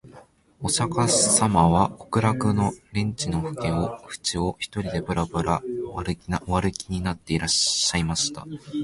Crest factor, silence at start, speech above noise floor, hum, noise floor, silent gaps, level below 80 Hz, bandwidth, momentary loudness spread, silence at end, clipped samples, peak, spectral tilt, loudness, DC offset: 20 dB; 0.05 s; 27 dB; none; -51 dBFS; none; -42 dBFS; 11.5 kHz; 11 LU; 0 s; under 0.1%; -4 dBFS; -4 dB/octave; -24 LUFS; under 0.1%